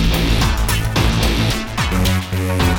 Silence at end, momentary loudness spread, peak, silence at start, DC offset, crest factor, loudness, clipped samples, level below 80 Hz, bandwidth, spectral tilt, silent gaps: 0 s; 3 LU; -2 dBFS; 0 s; under 0.1%; 14 dB; -17 LUFS; under 0.1%; -20 dBFS; over 20 kHz; -4.5 dB/octave; none